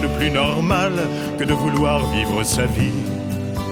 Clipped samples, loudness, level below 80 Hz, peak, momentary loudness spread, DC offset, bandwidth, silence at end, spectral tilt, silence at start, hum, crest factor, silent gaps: under 0.1%; -20 LUFS; -34 dBFS; -4 dBFS; 6 LU; under 0.1%; 19 kHz; 0 s; -5 dB/octave; 0 s; none; 16 dB; none